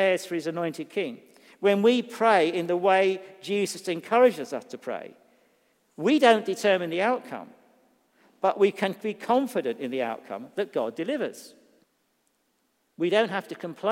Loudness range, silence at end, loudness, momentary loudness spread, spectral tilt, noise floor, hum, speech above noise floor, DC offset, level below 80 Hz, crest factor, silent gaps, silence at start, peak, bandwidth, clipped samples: 7 LU; 0 s; -26 LUFS; 14 LU; -5 dB/octave; -72 dBFS; none; 47 dB; under 0.1%; -86 dBFS; 24 dB; none; 0 s; -4 dBFS; 16 kHz; under 0.1%